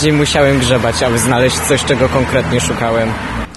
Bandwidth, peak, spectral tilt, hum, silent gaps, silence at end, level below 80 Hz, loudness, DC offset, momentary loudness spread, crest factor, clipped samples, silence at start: 12.5 kHz; 0 dBFS; -4.5 dB/octave; none; none; 0 s; -30 dBFS; -13 LUFS; 0.4%; 4 LU; 12 dB; under 0.1%; 0 s